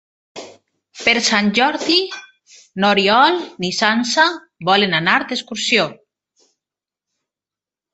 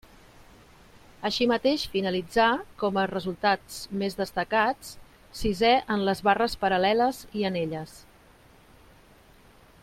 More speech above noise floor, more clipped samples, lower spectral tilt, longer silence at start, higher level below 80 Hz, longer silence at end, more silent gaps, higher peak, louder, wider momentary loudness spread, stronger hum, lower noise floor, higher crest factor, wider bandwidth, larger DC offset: first, 73 dB vs 29 dB; neither; second, -3 dB/octave vs -5 dB/octave; second, 0.35 s vs 1.2 s; second, -62 dBFS vs -50 dBFS; first, 2 s vs 1.8 s; neither; first, 0 dBFS vs -8 dBFS; first, -16 LUFS vs -26 LUFS; first, 14 LU vs 11 LU; neither; first, -89 dBFS vs -55 dBFS; about the same, 18 dB vs 18 dB; second, 8.4 kHz vs 16.5 kHz; neither